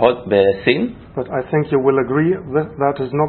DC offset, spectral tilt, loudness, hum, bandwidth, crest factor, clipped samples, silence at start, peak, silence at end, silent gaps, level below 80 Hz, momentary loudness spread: under 0.1%; -11.5 dB/octave; -17 LUFS; none; 4.4 kHz; 16 dB; under 0.1%; 0 s; 0 dBFS; 0 s; none; -48 dBFS; 9 LU